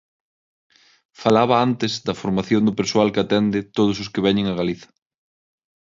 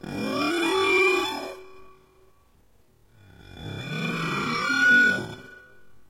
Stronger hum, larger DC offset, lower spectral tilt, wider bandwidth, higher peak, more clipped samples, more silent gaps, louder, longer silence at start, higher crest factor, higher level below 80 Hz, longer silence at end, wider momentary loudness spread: neither; neither; first, -6 dB/octave vs -4 dB/octave; second, 7.6 kHz vs 16.5 kHz; first, -2 dBFS vs -10 dBFS; neither; neither; about the same, -20 LUFS vs -22 LUFS; first, 1.2 s vs 0.05 s; about the same, 18 dB vs 18 dB; about the same, -54 dBFS vs -58 dBFS; first, 1.1 s vs 0.1 s; second, 7 LU vs 21 LU